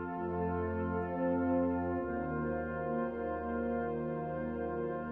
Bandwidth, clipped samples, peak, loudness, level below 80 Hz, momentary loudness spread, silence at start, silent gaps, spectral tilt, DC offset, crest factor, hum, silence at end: 3.7 kHz; under 0.1%; -22 dBFS; -35 LUFS; -54 dBFS; 5 LU; 0 s; none; -11.5 dB/octave; under 0.1%; 12 dB; none; 0 s